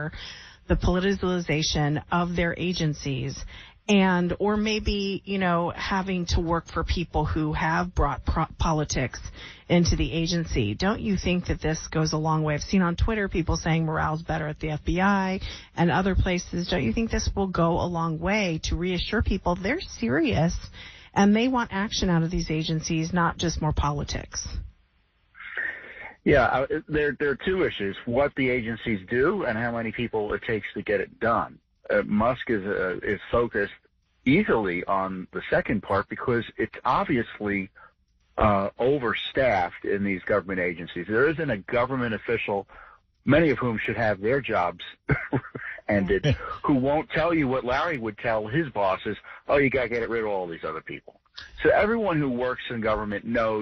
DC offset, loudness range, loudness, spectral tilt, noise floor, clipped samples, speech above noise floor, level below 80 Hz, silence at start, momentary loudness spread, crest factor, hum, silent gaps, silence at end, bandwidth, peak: under 0.1%; 2 LU; -26 LUFS; -5 dB/octave; -66 dBFS; under 0.1%; 40 dB; -38 dBFS; 0 s; 8 LU; 16 dB; none; none; 0 s; 7 kHz; -8 dBFS